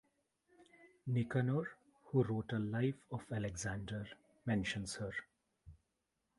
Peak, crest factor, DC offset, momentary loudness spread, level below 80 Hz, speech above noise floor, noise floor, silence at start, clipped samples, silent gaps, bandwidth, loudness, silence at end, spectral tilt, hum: -20 dBFS; 20 dB; under 0.1%; 11 LU; -64 dBFS; 47 dB; -86 dBFS; 0.6 s; under 0.1%; none; 11.5 kHz; -40 LUFS; 0.65 s; -6 dB/octave; none